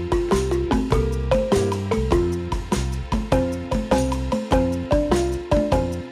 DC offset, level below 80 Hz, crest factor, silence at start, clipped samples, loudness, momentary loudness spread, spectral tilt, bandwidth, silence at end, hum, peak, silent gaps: under 0.1%; -28 dBFS; 16 dB; 0 s; under 0.1%; -22 LUFS; 5 LU; -6.5 dB/octave; 14.5 kHz; 0 s; none; -6 dBFS; none